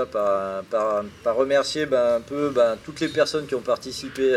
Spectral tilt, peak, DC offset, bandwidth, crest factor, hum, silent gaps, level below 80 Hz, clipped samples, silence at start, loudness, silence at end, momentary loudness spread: -4 dB/octave; -8 dBFS; under 0.1%; 13 kHz; 16 dB; none; none; -56 dBFS; under 0.1%; 0 s; -23 LUFS; 0 s; 6 LU